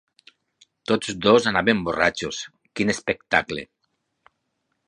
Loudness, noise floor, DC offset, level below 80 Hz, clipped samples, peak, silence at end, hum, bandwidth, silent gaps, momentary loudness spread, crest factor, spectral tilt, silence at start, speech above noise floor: -22 LUFS; -75 dBFS; under 0.1%; -54 dBFS; under 0.1%; -2 dBFS; 1.25 s; none; 11 kHz; none; 16 LU; 22 dB; -4 dB/octave; 0.9 s; 53 dB